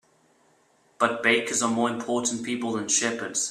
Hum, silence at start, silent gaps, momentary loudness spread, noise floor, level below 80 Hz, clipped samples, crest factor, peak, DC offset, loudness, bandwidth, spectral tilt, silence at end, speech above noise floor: none; 1 s; none; 6 LU; -63 dBFS; -70 dBFS; under 0.1%; 22 dB; -6 dBFS; under 0.1%; -25 LUFS; 13.5 kHz; -2 dB/octave; 0 s; 38 dB